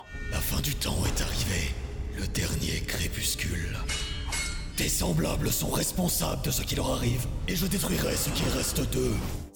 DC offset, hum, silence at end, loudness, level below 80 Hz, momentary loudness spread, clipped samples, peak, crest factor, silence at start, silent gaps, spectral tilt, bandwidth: under 0.1%; none; 0 s; -29 LUFS; -36 dBFS; 5 LU; under 0.1%; -16 dBFS; 12 dB; 0 s; none; -4 dB/octave; over 20 kHz